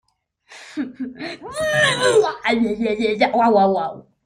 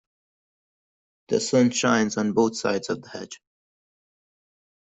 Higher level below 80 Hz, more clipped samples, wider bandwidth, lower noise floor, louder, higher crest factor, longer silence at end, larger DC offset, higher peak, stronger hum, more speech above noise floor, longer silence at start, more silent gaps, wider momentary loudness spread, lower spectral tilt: first, -56 dBFS vs -66 dBFS; neither; first, 15.5 kHz vs 8.2 kHz; second, -53 dBFS vs under -90 dBFS; first, -18 LUFS vs -23 LUFS; about the same, 16 dB vs 20 dB; second, 0.25 s vs 1.45 s; neither; about the same, -4 dBFS vs -6 dBFS; neither; second, 35 dB vs over 67 dB; second, 0.5 s vs 1.3 s; neither; second, 14 LU vs 18 LU; about the same, -4 dB/octave vs -4.5 dB/octave